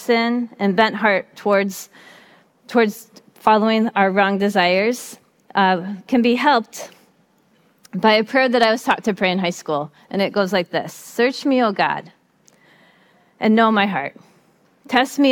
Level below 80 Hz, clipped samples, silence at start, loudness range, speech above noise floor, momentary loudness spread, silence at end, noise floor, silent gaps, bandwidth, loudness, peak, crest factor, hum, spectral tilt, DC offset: -66 dBFS; under 0.1%; 0 s; 3 LU; 40 dB; 12 LU; 0 s; -58 dBFS; none; 17.5 kHz; -18 LUFS; -2 dBFS; 18 dB; none; -5 dB/octave; under 0.1%